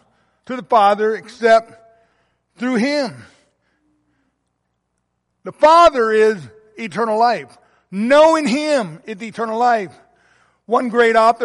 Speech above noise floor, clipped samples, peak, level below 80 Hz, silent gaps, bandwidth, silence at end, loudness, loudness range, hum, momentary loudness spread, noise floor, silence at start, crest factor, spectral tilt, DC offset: 56 dB; under 0.1%; -2 dBFS; -56 dBFS; none; 11.5 kHz; 0 s; -15 LUFS; 11 LU; 60 Hz at -65 dBFS; 18 LU; -71 dBFS; 0.5 s; 16 dB; -4.5 dB/octave; under 0.1%